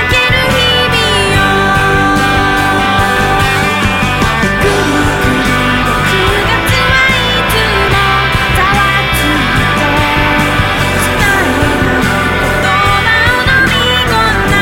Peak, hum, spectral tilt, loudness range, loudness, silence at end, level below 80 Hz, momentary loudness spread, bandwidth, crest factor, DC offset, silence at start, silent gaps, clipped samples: 0 dBFS; none; -4 dB/octave; 1 LU; -9 LUFS; 0 s; -22 dBFS; 3 LU; 17 kHz; 10 dB; under 0.1%; 0 s; none; under 0.1%